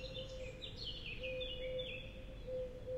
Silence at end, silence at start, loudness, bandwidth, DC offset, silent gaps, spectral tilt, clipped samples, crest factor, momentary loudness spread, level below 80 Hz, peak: 0 s; 0 s; -45 LUFS; 13.5 kHz; under 0.1%; none; -5 dB/octave; under 0.1%; 14 dB; 6 LU; -54 dBFS; -32 dBFS